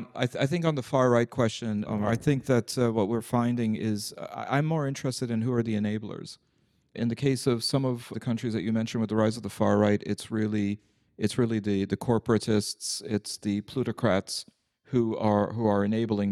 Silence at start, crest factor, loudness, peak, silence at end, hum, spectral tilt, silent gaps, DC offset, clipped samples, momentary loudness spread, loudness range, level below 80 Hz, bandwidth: 0 s; 18 dB; -28 LUFS; -10 dBFS; 0 s; none; -6 dB/octave; none; under 0.1%; under 0.1%; 7 LU; 3 LU; -60 dBFS; 14 kHz